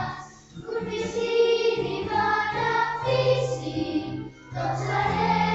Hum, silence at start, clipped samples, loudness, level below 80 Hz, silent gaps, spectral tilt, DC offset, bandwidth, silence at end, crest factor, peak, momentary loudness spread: none; 0 s; under 0.1%; -25 LUFS; -52 dBFS; none; -5.5 dB/octave; under 0.1%; 8.2 kHz; 0 s; 16 dB; -10 dBFS; 13 LU